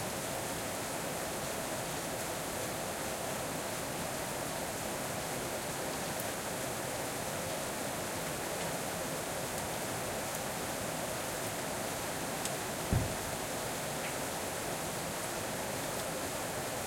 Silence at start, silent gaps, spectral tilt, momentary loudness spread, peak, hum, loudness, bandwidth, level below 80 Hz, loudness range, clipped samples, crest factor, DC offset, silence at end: 0 s; none; -3 dB/octave; 1 LU; -16 dBFS; none; -36 LUFS; 16.5 kHz; -56 dBFS; 1 LU; under 0.1%; 22 dB; under 0.1%; 0 s